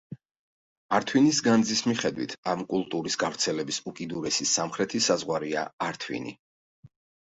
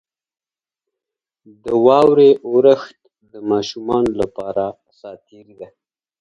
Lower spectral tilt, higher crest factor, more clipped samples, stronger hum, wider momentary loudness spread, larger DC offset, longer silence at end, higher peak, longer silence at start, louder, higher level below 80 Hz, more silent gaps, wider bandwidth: second, -3 dB/octave vs -6.5 dB/octave; about the same, 20 dB vs 18 dB; neither; neither; second, 12 LU vs 15 LU; neither; second, 0.35 s vs 0.55 s; second, -8 dBFS vs 0 dBFS; second, 0.1 s vs 1.65 s; second, -27 LUFS vs -15 LUFS; second, -66 dBFS vs -52 dBFS; first, 0.25-0.89 s, 2.38-2.43 s, 5.73-5.78 s, 6.39-6.83 s vs none; about the same, 8.2 kHz vs 7.8 kHz